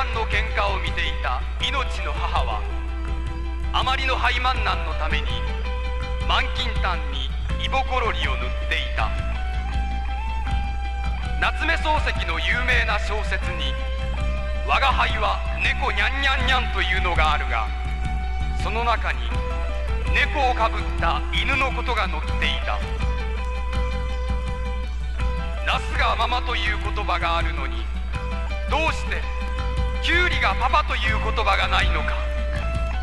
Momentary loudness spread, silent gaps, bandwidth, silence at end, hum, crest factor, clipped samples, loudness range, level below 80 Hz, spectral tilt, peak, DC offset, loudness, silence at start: 8 LU; none; 10.5 kHz; 0 s; none; 18 dB; under 0.1%; 4 LU; -26 dBFS; -5 dB/octave; -4 dBFS; under 0.1%; -23 LUFS; 0 s